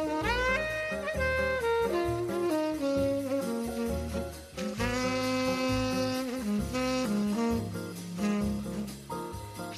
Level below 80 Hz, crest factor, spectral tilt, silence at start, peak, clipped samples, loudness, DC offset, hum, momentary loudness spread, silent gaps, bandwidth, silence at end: -46 dBFS; 12 dB; -5 dB/octave; 0 s; -18 dBFS; under 0.1%; -31 LUFS; under 0.1%; none; 10 LU; none; 15 kHz; 0 s